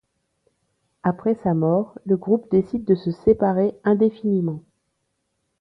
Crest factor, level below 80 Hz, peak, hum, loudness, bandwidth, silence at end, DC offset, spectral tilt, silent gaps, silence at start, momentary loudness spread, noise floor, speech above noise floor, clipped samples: 16 dB; -54 dBFS; -6 dBFS; none; -21 LUFS; 5.4 kHz; 1 s; under 0.1%; -11 dB/octave; none; 1.05 s; 5 LU; -74 dBFS; 54 dB; under 0.1%